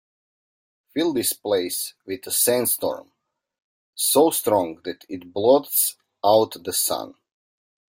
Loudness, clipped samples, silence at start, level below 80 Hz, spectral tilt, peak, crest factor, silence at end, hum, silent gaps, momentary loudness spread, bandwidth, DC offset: -21 LUFS; under 0.1%; 0.95 s; -68 dBFS; -2.5 dB/octave; -4 dBFS; 20 dB; 0.85 s; none; 3.64-3.93 s; 15 LU; 16.5 kHz; under 0.1%